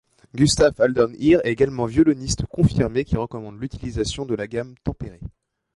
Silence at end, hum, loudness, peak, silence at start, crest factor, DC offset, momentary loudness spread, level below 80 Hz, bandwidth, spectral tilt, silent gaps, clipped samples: 0.45 s; none; -21 LUFS; -6 dBFS; 0.35 s; 16 dB; under 0.1%; 15 LU; -38 dBFS; 11.5 kHz; -5.5 dB/octave; none; under 0.1%